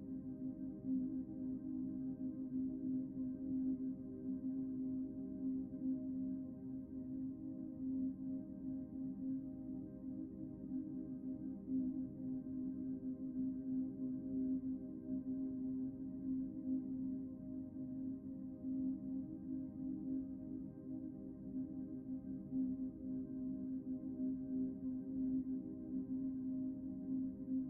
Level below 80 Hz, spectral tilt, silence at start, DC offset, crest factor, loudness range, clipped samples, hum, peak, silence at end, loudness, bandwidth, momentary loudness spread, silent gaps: -68 dBFS; -13 dB/octave; 0 s; under 0.1%; 12 dB; 3 LU; under 0.1%; none; -32 dBFS; 0 s; -44 LUFS; 1.7 kHz; 6 LU; none